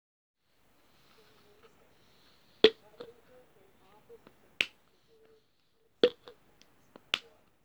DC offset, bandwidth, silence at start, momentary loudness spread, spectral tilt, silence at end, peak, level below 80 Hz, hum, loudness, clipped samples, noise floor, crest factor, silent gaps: under 0.1%; 20 kHz; 2.65 s; 25 LU; -3 dB/octave; 0.45 s; -4 dBFS; -76 dBFS; none; -30 LUFS; under 0.1%; -73 dBFS; 34 dB; none